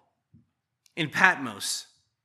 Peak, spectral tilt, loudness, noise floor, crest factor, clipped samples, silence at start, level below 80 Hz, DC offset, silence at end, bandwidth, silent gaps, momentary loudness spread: 0 dBFS; -2.5 dB/octave; -25 LUFS; -69 dBFS; 30 dB; under 0.1%; 0.95 s; -80 dBFS; under 0.1%; 0.4 s; 15 kHz; none; 12 LU